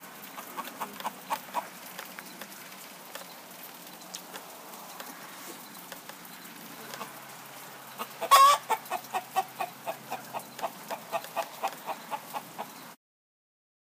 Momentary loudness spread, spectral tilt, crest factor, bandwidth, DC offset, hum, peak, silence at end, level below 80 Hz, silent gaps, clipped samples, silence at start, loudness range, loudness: 12 LU; -1 dB/octave; 26 dB; 15.5 kHz; under 0.1%; none; -8 dBFS; 1 s; under -90 dBFS; none; under 0.1%; 0 s; 16 LU; -31 LUFS